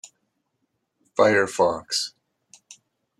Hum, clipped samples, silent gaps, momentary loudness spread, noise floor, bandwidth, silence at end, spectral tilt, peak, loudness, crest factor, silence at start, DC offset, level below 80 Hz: none; under 0.1%; none; 11 LU; -75 dBFS; 13.5 kHz; 1.1 s; -3 dB/octave; -6 dBFS; -22 LUFS; 20 dB; 1.15 s; under 0.1%; -68 dBFS